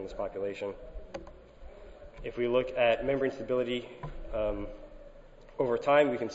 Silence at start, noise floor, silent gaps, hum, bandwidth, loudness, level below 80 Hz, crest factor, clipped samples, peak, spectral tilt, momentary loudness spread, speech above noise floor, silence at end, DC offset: 0 s; -52 dBFS; none; none; 8 kHz; -31 LUFS; -48 dBFS; 22 dB; under 0.1%; -10 dBFS; -6 dB/octave; 24 LU; 21 dB; 0 s; under 0.1%